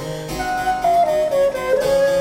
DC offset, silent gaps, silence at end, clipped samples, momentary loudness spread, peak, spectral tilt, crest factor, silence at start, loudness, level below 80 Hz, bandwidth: under 0.1%; none; 0 s; under 0.1%; 7 LU; -6 dBFS; -4.5 dB/octave; 10 dB; 0 s; -18 LUFS; -42 dBFS; 16.5 kHz